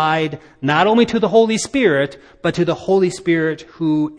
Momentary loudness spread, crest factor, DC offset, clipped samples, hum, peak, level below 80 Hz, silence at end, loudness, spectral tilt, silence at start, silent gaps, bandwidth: 9 LU; 16 dB; under 0.1%; under 0.1%; none; 0 dBFS; -52 dBFS; 0 s; -17 LUFS; -5.5 dB/octave; 0 s; none; 10.5 kHz